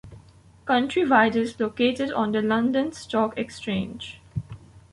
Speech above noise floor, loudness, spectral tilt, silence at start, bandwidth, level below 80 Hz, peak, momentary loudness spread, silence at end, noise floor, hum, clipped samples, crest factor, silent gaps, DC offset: 28 dB; -24 LUFS; -5.5 dB/octave; 0.05 s; 11.5 kHz; -54 dBFS; -6 dBFS; 16 LU; 0.15 s; -52 dBFS; none; under 0.1%; 20 dB; none; under 0.1%